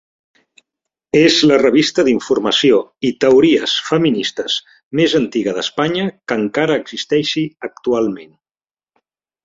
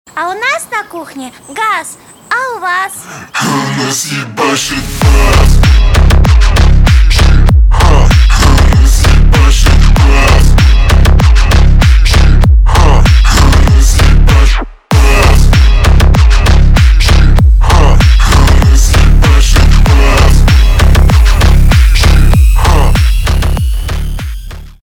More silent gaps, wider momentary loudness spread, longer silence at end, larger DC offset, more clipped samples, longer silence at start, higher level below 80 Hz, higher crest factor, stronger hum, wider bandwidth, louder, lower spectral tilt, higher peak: first, 4.85-4.91 s vs none; about the same, 10 LU vs 8 LU; first, 1.2 s vs 0 s; second, under 0.1% vs 5%; second, under 0.1% vs 0.5%; first, 1.15 s vs 0.05 s; second, -56 dBFS vs -6 dBFS; first, 16 dB vs 6 dB; neither; second, 7.8 kHz vs 17 kHz; second, -15 LUFS vs -8 LUFS; about the same, -4.5 dB/octave vs -5 dB/octave; about the same, 0 dBFS vs 0 dBFS